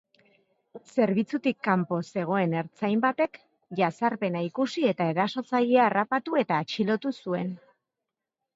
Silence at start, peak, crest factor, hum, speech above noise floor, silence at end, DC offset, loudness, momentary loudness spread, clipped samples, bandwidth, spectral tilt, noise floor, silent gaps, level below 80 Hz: 0.75 s; -8 dBFS; 18 dB; none; 61 dB; 1 s; under 0.1%; -27 LUFS; 7 LU; under 0.1%; 7.8 kHz; -7 dB/octave; -87 dBFS; none; -76 dBFS